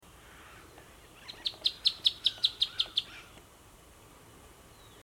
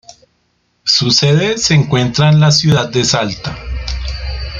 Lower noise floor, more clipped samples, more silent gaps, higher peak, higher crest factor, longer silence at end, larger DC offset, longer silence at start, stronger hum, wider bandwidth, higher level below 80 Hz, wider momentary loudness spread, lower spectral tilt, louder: second, -56 dBFS vs -61 dBFS; neither; neither; second, -12 dBFS vs 0 dBFS; first, 24 dB vs 14 dB; first, 1.65 s vs 0 s; neither; second, 0.25 s vs 0.85 s; neither; first, 18 kHz vs 7.6 kHz; second, -62 dBFS vs -28 dBFS; first, 25 LU vs 13 LU; second, -0.5 dB/octave vs -4.5 dB/octave; second, -29 LUFS vs -12 LUFS